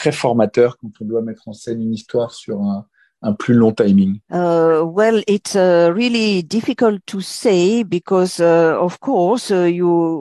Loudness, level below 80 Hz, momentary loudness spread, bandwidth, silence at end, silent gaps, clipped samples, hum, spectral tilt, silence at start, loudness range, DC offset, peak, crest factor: -16 LUFS; -56 dBFS; 10 LU; 12.5 kHz; 0 s; none; under 0.1%; none; -6 dB/octave; 0 s; 5 LU; under 0.1%; -2 dBFS; 14 dB